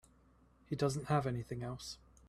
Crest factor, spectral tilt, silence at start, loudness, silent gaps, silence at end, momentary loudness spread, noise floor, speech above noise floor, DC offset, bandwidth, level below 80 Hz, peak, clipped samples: 20 dB; -6 dB/octave; 0.7 s; -39 LUFS; none; 0.35 s; 11 LU; -67 dBFS; 30 dB; under 0.1%; 14 kHz; -62 dBFS; -20 dBFS; under 0.1%